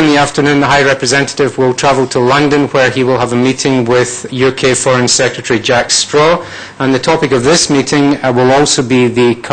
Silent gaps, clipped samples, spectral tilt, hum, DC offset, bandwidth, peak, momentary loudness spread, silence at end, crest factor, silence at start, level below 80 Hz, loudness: none; under 0.1%; -4 dB/octave; none; under 0.1%; 9.4 kHz; 0 dBFS; 4 LU; 0 s; 10 dB; 0 s; -40 dBFS; -10 LUFS